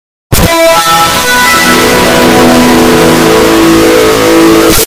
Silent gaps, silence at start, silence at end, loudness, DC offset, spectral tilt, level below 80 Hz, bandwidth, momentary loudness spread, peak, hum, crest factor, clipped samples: none; 0.3 s; 0 s; -4 LUFS; under 0.1%; -3.5 dB/octave; -22 dBFS; over 20 kHz; 1 LU; 0 dBFS; none; 4 dB; 8%